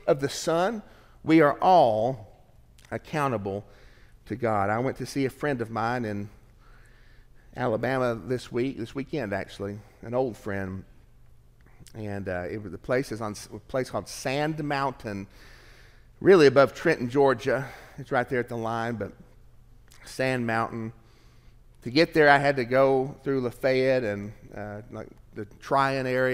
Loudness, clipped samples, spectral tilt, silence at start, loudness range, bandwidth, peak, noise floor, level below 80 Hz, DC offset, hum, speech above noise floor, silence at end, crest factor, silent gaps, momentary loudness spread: -26 LUFS; under 0.1%; -6 dB/octave; 0.05 s; 10 LU; 16 kHz; -4 dBFS; -54 dBFS; -54 dBFS; under 0.1%; none; 29 dB; 0 s; 22 dB; none; 20 LU